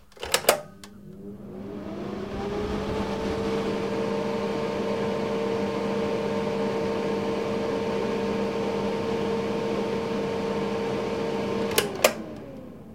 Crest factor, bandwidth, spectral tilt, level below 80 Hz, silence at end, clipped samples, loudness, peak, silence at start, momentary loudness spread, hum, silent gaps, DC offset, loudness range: 28 dB; 16.5 kHz; -4.5 dB/octave; -50 dBFS; 0 s; under 0.1%; -27 LUFS; 0 dBFS; 0.15 s; 13 LU; none; none; 0.2%; 3 LU